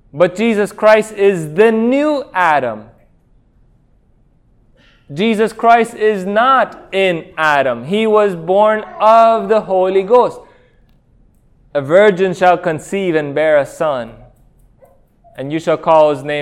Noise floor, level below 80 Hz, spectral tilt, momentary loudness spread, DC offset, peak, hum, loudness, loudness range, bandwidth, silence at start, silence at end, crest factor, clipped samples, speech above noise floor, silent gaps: -52 dBFS; -52 dBFS; -5.5 dB/octave; 8 LU; under 0.1%; 0 dBFS; none; -13 LUFS; 6 LU; 13 kHz; 0.15 s; 0 s; 14 dB; under 0.1%; 39 dB; none